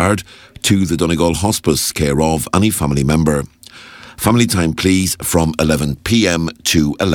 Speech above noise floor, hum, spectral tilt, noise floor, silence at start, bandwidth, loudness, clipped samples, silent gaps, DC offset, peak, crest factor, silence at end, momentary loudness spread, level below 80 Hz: 23 dB; none; -4.5 dB/octave; -38 dBFS; 0 s; 19 kHz; -15 LUFS; under 0.1%; none; under 0.1%; 0 dBFS; 16 dB; 0 s; 5 LU; -32 dBFS